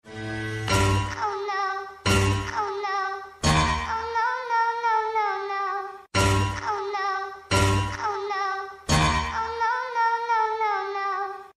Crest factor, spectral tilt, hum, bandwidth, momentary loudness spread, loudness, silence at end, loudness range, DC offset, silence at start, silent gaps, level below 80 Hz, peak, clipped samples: 18 dB; -4.5 dB/octave; none; 13.5 kHz; 7 LU; -25 LUFS; 0.05 s; 1 LU; under 0.1%; 0.05 s; none; -40 dBFS; -8 dBFS; under 0.1%